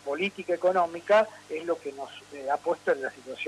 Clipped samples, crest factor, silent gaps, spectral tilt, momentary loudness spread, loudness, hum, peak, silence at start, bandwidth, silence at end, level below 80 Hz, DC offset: under 0.1%; 18 dB; none; -4.5 dB/octave; 15 LU; -28 LUFS; 50 Hz at -65 dBFS; -10 dBFS; 0.05 s; 12.5 kHz; 0 s; -74 dBFS; under 0.1%